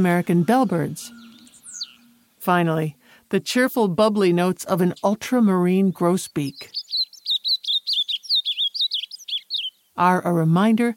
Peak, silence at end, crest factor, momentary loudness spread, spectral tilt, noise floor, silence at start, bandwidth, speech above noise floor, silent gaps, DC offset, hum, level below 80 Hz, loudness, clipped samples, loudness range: -4 dBFS; 0 s; 16 dB; 11 LU; -5.5 dB/octave; -54 dBFS; 0 s; 17 kHz; 35 dB; none; under 0.1%; none; -66 dBFS; -21 LUFS; under 0.1%; 4 LU